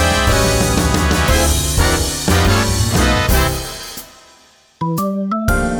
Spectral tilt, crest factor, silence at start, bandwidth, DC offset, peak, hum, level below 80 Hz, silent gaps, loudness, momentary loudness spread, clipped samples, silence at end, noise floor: -4 dB/octave; 14 dB; 0 s; over 20 kHz; under 0.1%; 0 dBFS; none; -22 dBFS; none; -15 LUFS; 10 LU; under 0.1%; 0 s; -49 dBFS